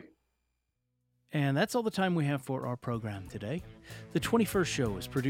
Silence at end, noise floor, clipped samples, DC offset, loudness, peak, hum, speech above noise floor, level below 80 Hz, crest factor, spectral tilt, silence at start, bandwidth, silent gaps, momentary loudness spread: 0 s; -81 dBFS; under 0.1%; under 0.1%; -32 LUFS; -14 dBFS; none; 50 dB; -56 dBFS; 18 dB; -5.5 dB/octave; 0 s; 16.5 kHz; none; 11 LU